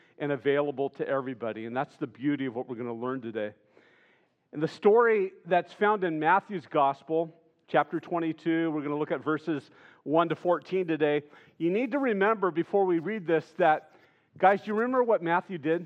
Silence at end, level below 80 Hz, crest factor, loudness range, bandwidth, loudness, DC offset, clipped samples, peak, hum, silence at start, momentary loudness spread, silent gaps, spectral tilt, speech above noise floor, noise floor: 0 s; -88 dBFS; 20 dB; 6 LU; 8 kHz; -28 LUFS; under 0.1%; under 0.1%; -8 dBFS; none; 0.2 s; 9 LU; none; -8 dB/octave; 39 dB; -66 dBFS